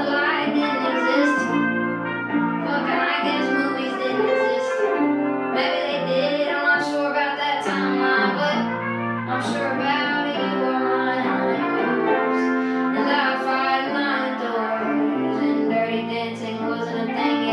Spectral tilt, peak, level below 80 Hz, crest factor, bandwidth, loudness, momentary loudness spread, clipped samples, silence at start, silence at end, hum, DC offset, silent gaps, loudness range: -5.5 dB/octave; -6 dBFS; -76 dBFS; 14 dB; 10.5 kHz; -22 LUFS; 5 LU; under 0.1%; 0 s; 0 s; none; under 0.1%; none; 1 LU